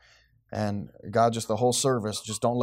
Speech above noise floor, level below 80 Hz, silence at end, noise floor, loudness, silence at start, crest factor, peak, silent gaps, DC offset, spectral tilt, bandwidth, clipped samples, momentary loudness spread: 34 dB; -64 dBFS; 0 s; -61 dBFS; -27 LUFS; 0.5 s; 18 dB; -10 dBFS; none; under 0.1%; -4.5 dB/octave; 16 kHz; under 0.1%; 8 LU